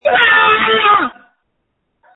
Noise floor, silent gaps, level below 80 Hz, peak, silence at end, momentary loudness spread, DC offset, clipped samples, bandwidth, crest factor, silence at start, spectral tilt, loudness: -68 dBFS; none; -52 dBFS; 0 dBFS; 1.05 s; 6 LU; under 0.1%; under 0.1%; 4.1 kHz; 14 dB; 0.05 s; -5 dB/octave; -10 LUFS